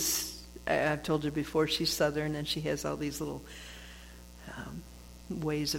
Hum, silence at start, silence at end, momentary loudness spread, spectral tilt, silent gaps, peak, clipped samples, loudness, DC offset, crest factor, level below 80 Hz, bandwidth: 60 Hz at -50 dBFS; 0 s; 0 s; 19 LU; -3.5 dB/octave; none; -16 dBFS; under 0.1%; -32 LUFS; under 0.1%; 18 dB; -52 dBFS; 17 kHz